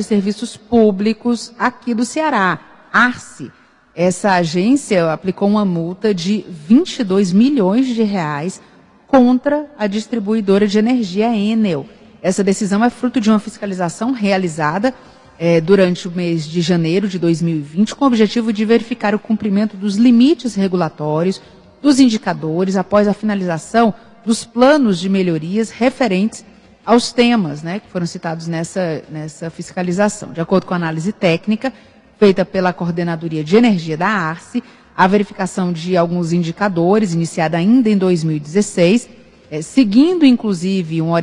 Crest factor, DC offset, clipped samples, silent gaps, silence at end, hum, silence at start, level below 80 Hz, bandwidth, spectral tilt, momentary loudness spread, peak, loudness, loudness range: 16 dB; under 0.1%; under 0.1%; none; 0 s; none; 0 s; -54 dBFS; 11 kHz; -6 dB/octave; 10 LU; 0 dBFS; -16 LUFS; 3 LU